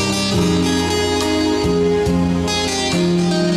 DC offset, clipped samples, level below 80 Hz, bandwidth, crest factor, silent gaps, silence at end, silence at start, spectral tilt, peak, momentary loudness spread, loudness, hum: under 0.1%; under 0.1%; -36 dBFS; 14 kHz; 12 dB; none; 0 s; 0 s; -5 dB/octave; -6 dBFS; 1 LU; -17 LUFS; none